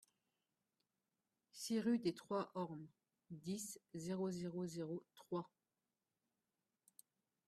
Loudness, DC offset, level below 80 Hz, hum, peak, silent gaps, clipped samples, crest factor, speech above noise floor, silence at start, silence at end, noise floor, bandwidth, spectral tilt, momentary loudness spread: -45 LUFS; under 0.1%; -86 dBFS; none; -28 dBFS; none; under 0.1%; 20 dB; over 46 dB; 1.55 s; 2 s; under -90 dBFS; 13.5 kHz; -5.5 dB/octave; 16 LU